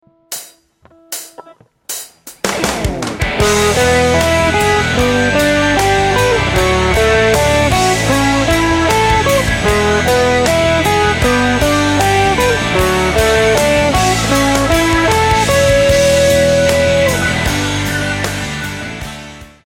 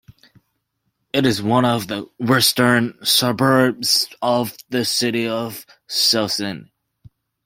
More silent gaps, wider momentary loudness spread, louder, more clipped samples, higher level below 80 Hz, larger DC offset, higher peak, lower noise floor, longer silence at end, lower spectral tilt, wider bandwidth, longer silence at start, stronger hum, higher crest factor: neither; about the same, 12 LU vs 10 LU; first, -12 LUFS vs -18 LUFS; neither; first, -26 dBFS vs -58 dBFS; neither; about the same, 0 dBFS vs 0 dBFS; second, -48 dBFS vs -72 dBFS; second, 0.2 s vs 0.85 s; about the same, -4 dB/octave vs -3.5 dB/octave; about the same, 17 kHz vs 16.5 kHz; second, 0.3 s vs 1.15 s; neither; second, 12 dB vs 20 dB